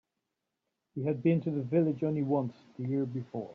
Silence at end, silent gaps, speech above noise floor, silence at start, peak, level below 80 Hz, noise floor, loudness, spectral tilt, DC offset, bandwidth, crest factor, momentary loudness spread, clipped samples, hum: 0 s; none; 54 dB; 0.95 s; -16 dBFS; -76 dBFS; -85 dBFS; -32 LUFS; -10 dB/octave; under 0.1%; 5.2 kHz; 16 dB; 11 LU; under 0.1%; none